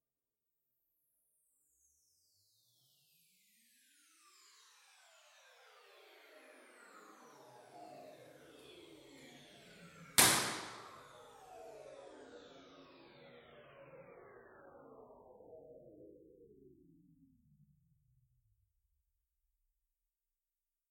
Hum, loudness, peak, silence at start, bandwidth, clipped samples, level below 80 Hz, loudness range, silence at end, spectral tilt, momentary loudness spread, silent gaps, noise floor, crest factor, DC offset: none; -31 LUFS; -8 dBFS; 5.65 s; 16.5 kHz; under 0.1%; -76 dBFS; 26 LU; 4.2 s; -1 dB/octave; 23 LU; none; under -90 dBFS; 40 dB; under 0.1%